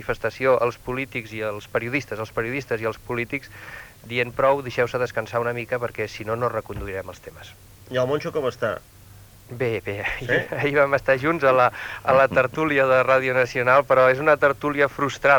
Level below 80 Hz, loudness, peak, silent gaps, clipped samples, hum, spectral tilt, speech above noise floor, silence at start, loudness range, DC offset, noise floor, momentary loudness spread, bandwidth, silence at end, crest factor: -50 dBFS; -22 LUFS; -4 dBFS; none; under 0.1%; none; -6 dB/octave; 25 dB; 0 s; 9 LU; under 0.1%; -47 dBFS; 12 LU; over 20 kHz; 0 s; 18 dB